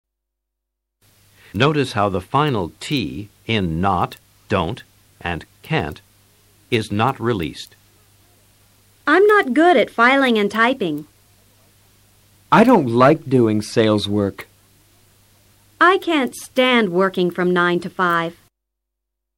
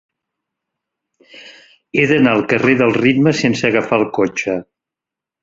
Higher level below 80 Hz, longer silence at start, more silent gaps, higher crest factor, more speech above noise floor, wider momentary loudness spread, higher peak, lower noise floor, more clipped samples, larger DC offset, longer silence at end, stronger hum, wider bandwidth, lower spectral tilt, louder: about the same, -50 dBFS vs -54 dBFS; first, 1.55 s vs 1.35 s; neither; about the same, 16 dB vs 16 dB; second, 63 dB vs 71 dB; first, 14 LU vs 8 LU; about the same, -2 dBFS vs 0 dBFS; second, -80 dBFS vs -86 dBFS; neither; neither; first, 1.05 s vs 0.8 s; neither; first, 16.5 kHz vs 7.8 kHz; about the same, -6 dB/octave vs -6 dB/octave; about the same, -17 LUFS vs -15 LUFS